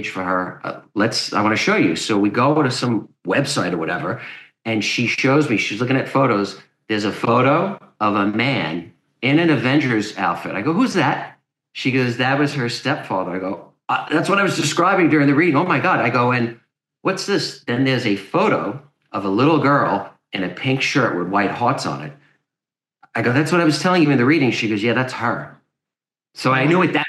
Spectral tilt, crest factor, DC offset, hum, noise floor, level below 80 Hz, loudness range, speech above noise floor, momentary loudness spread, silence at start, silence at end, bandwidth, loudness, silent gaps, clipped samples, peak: -5.5 dB/octave; 16 dB; under 0.1%; none; -89 dBFS; -68 dBFS; 3 LU; 71 dB; 11 LU; 0 s; 0 s; 12.5 kHz; -18 LUFS; none; under 0.1%; -2 dBFS